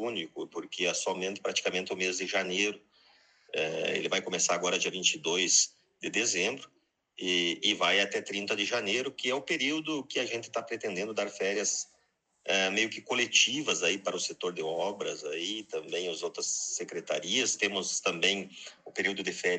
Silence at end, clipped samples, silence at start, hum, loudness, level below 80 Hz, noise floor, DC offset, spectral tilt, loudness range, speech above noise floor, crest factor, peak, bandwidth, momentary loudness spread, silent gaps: 0 s; under 0.1%; 0 s; none; -30 LUFS; -84 dBFS; -73 dBFS; under 0.1%; -1 dB/octave; 4 LU; 41 dB; 22 dB; -10 dBFS; 9.4 kHz; 10 LU; none